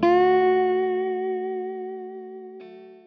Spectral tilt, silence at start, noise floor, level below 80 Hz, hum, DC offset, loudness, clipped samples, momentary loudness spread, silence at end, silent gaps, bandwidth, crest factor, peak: -7.5 dB/octave; 0 s; -43 dBFS; -60 dBFS; none; under 0.1%; -23 LUFS; under 0.1%; 22 LU; 0.1 s; none; 5.2 kHz; 16 dB; -6 dBFS